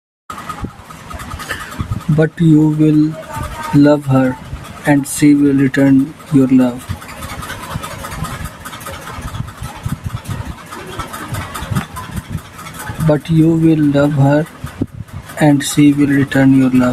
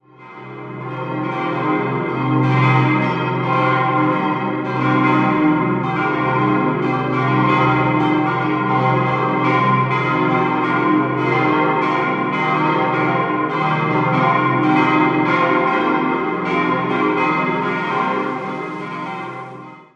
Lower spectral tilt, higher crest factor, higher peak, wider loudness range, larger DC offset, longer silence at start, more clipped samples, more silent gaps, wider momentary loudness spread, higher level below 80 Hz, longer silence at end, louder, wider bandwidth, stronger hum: second, -6.5 dB/octave vs -8 dB/octave; about the same, 14 dB vs 16 dB; about the same, 0 dBFS vs -2 dBFS; first, 13 LU vs 2 LU; neither; about the same, 0.3 s vs 0.2 s; neither; neither; first, 17 LU vs 10 LU; first, -36 dBFS vs -54 dBFS; second, 0 s vs 0.15 s; first, -14 LUFS vs -17 LUFS; first, 15 kHz vs 7.6 kHz; neither